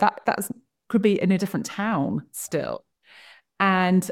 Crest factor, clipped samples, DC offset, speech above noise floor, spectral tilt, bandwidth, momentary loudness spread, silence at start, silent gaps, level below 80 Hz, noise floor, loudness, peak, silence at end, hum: 20 dB; under 0.1%; under 0.1%; 28 dB; -5.5 dB/octave; 16 kHz; 12 LU; 0 s; none; -66 dBFS; -51 dBFS; -24 LUFS; -6 dBFS; 0 s; none